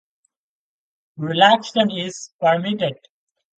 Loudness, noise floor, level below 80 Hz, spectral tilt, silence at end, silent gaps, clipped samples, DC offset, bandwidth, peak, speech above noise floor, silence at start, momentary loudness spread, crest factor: -19 LUFS; -72 dBFS; -68 dBFS; -4.5 dB/octave; 0.65 s; 2.32-2.39 s; under 0.1%; under 0.1%; 9.2 kHz; 0 dBFS; 54 dB; 1.2 s; 13 LU; 22 dB